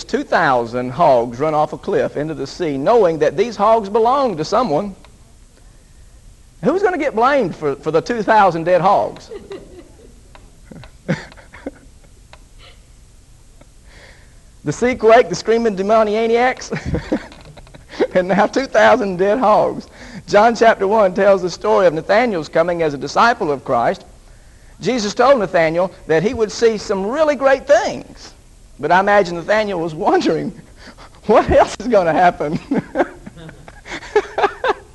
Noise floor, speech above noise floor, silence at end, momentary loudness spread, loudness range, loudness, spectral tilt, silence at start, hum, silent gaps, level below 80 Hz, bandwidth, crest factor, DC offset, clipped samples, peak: -45 dBFS; 29 dB; 0.15 s; 13 LU; 7 LU; -16 LUFS; -5.5 dB/octave; 0 s; none; none; -42 dBFS; 12 kHz; 16 dB; under 0.1%; under 0.1%; 0 dBFS